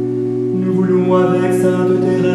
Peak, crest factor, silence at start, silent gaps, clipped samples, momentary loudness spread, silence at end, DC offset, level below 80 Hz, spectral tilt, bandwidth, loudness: -2 dBFS; 12 dB; 0 s; none; under 0.1%; 5 LU; 0 s; under 0.1%; -52 dBFS; -8 dB/octave; 12.5 kHz; -15 LUFS